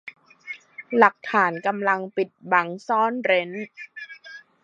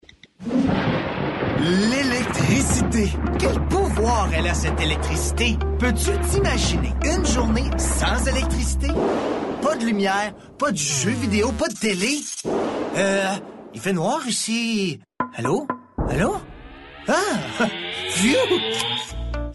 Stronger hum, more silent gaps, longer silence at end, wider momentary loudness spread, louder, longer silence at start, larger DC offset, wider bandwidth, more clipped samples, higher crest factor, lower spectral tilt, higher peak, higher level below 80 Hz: neither; neither; first, 0.25 s vs 0 s; first, 20 LU vs 7 LU; about the same, -22 LUFS vs -22 LUFS; second, 0.05 s vs 0.4 s; neither; second, 8 kHz vs 12 kHz; neither; first, 24 dB vs 16 dB; about the same, -5.5 dB/octave vs -4.5 dB/octave; first, 0 dBFS vs -6 dBFS; second, -76 dBFS vs -28 dBFS